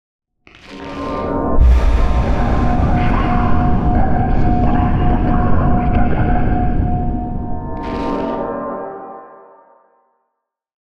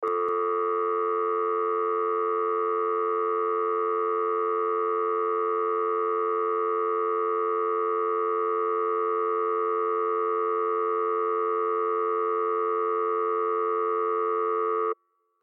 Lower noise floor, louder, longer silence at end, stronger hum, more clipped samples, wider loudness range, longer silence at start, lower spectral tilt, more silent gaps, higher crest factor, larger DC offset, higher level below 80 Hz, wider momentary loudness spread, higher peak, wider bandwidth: first, -74 dBFS vs -47 dBFS; first, -17 LUFS vs -26 LUFS; second, 0.25 s vs 0.5 s; neither; neither; first, 9 LU vs 0 LU; first, 0.2 s vs 0 s; first, -9 dB/octave vs -6 dB/octave; neither; about the same, 12 dB vs 8 dB; neither; first, -18 dBFS vs -90 dBFS; first, 10 LU vs 0 LU; first, -2 dBFS vs -18 dBFS; first, 6.4 kHz vs 3.7 kHz